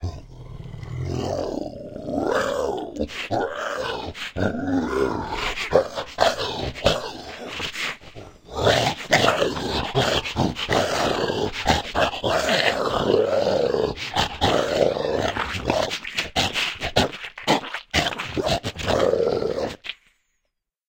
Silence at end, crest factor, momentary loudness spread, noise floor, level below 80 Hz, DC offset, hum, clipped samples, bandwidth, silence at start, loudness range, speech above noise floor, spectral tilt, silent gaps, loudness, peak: 0.95 s; 22 dB; 12 LU; -77 dBFS; -42 dBFS; under 0.1%; none; under 0.1%; 16.5 kHz; 0 s; 5 LU; 53 dB; -4 dB/octave; none; -23 LUFS; -2 dBFS